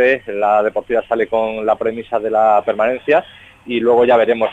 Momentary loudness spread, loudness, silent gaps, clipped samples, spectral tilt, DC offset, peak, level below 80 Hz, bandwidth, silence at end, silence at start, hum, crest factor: 7 LU; -16 LUFS; none; under 0.1%; -6.5 dB/octave; under 0.1%; -2 dBFS; -52 dBFS; 7.8 kHz; 0 s; 0 s; none; 14 dB